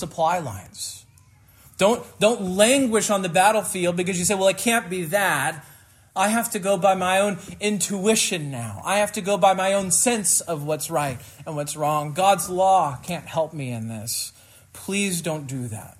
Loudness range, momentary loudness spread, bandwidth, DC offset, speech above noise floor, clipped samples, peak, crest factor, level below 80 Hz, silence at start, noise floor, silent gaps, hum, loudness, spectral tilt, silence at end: 3 LU; 13 LU; 16 kHz; under 0.1%; 31 dB; under 0.1%; -4 dBFS; 18 dB; -60 dBFS; 0 s; -53 dBFS; none; none; -22 LUFS; -3.5 dB/octave; 0.1 s